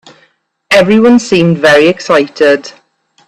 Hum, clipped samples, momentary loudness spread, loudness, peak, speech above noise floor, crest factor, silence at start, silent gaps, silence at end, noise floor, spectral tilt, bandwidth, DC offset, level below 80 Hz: none; 0.2%; 4 LU; -8 LUFS; 0 dBFS; 45 dB; 10 dB; 0.7 s; none; 0.55 s; -53 dBFS; -5.5 dB/octave; 14 kHz; under 0.1%; -48 dBFS